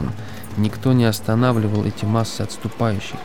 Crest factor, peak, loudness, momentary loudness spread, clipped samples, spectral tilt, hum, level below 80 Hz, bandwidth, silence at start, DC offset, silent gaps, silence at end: 16 dB; -4 dBFS; -20 LUFS; 10 LU; under 0.1%; -6.5 dB/octave; none; -48 dBFS; 18 kHz; 0 s; 2%; none; 0 s